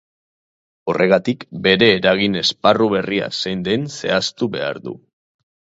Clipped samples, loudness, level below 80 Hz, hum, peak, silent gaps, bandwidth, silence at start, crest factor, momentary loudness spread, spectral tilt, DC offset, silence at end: under 0.1%; -17 LUFS; -54 dBFS; none; 0 dBFS; none; 8 kHz; 0.85 s; 18 dB; 12 LU; -4.5 dB/octave; under 0.1%; 0.85 s